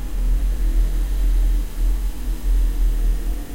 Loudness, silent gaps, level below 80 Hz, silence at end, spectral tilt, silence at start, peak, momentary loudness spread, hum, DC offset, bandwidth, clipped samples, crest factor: -24 LUFS; none; -18 dBFS; 0 s; -6 dB/octave; 0 s; -8 dBFS; 5 LU; none; under 0.1%; 16 kHz; under 0.1%; 10 dB